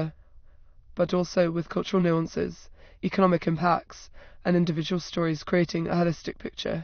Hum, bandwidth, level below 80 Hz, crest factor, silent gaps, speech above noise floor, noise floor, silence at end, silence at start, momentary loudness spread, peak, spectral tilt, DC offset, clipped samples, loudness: none; 6.6 kHz; -52 dBFS; 20 dB; none; 25 dB; -51 dBFS; 0 s; 0 s; 10 LU; -8 dBFS; -6 dB/octave; under 0.1%; under 0.1%; -27 LUFS